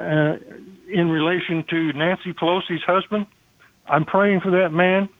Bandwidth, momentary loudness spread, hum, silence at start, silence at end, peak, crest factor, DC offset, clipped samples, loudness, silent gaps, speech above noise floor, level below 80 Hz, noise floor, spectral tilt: 6.6 kHz; 8 LU; none; 0 s; 0.1 s; -4 dBFS; 18 dB; under 0.1%; under 0.1%; -20 LUFS; none; 36 dB; -62 dBFS; -56 dBFS; -8.5 dB/octave